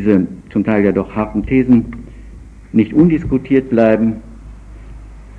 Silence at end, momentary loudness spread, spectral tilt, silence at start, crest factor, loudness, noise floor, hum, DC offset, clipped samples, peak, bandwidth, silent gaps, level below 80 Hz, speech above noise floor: 0 s; 8 LU; -10 dB/octave; 0 s; 14 dB; -14 LUFS; -35 dBFS; none; under 0.1%; under 0.1%; 0 dBFS; 4.8 kHz; none; -34 dBFS; 22 dB